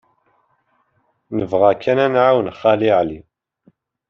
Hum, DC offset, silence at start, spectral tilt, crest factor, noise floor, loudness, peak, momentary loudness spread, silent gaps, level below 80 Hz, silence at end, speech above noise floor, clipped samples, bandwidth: none; under 0.1%; 1.3 s; -4.5 dB/octave; 18 dB; -65 dBFS; -16 LUFS; -2 dBFS; 11 LU; none; -56 dBFS; 0.9 s; 49 dB; under 0.1%; 6.6 kHz